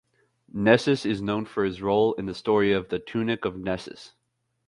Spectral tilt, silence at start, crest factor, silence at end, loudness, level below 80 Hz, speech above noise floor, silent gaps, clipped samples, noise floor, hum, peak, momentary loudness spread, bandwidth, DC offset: -6.5 dB/octave; 0.55 s; 20 dB; 0.6 s; -25 LUFS; -56 dBFS; 51 dB; none; under 0.1%; -76 dBFS; none; -4 dBFS; 11 LU; 11 kHz; under 0.1%